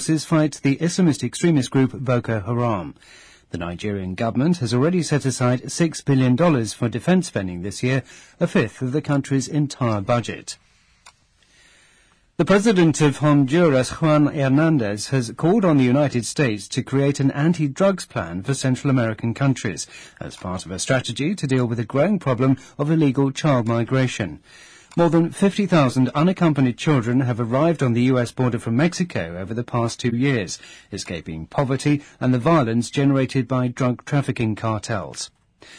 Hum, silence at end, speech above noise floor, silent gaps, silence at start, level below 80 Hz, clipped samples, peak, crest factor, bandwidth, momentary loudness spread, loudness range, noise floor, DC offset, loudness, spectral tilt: none; 0 s; 38 dB; none; 0 s; -52 dBFS; under 0.1%; -6 dBFS; 14 dB; 11 kHz; 11 LU; 5 LU; -58 dBFS; under 0.1%; -20 LUFS; -6.5 dB/octave